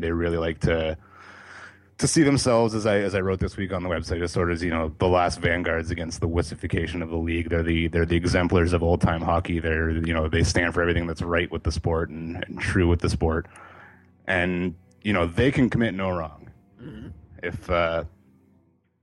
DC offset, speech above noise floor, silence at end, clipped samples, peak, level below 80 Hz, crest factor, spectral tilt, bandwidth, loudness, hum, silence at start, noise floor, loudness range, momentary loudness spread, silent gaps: under 0.1%; 39 dB; 0.95 s; under 0.1%; -6 dBFS; -38 dBFS; 18 dB; -5.5 dB/octave; 11.5 kHz; -24 LUFS; none; 0 s; -63 dBFS; 3 LU; 12 LU; none